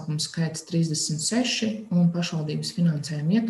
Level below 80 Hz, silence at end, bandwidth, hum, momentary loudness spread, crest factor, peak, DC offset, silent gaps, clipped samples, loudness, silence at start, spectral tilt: -64 dBFS; 0 s; 12.5 kHz; none; 5 LU; 14 dB; -12 dBFS; under 0.1%; none; under 0.1%; -25 LUFS; 0 s; -5 dB/octave